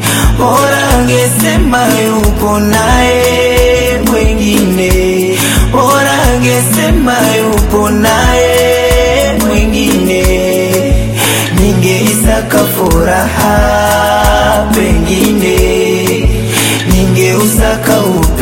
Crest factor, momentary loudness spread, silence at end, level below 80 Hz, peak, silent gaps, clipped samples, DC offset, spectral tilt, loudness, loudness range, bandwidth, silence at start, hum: 8 dB; 2 LU; 0 s; -16 dBFS; 0 dBFS; none; 0.4%; under 0.1%; -4.5 dB/octave; -9 LUFS; 1 LU; 17 kHz; 0 s; none